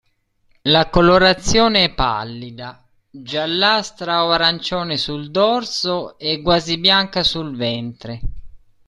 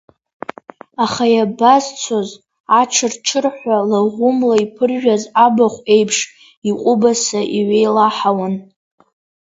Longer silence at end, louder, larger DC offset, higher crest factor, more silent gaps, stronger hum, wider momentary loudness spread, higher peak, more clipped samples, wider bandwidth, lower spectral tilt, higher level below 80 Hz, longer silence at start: second, 0.3 s vs 0.8 s; about the same, -17 LUFS vs -15 LUFS; neither; about the same, 18 dB vs 16 dB; second, none vs 2.60-2.64 s, 6.57-6.62 s; neither; first, 18 LU vs 12 LU; about the same, 0 dBFS vs 0 dBFS; neither; first, 12 kHz vs 8 kHz; about the same, -4 dB/octave vs -3.5 dB/octave; first, -36 dBFS vs -62 dBFS; second, 0.65 s vs 1 s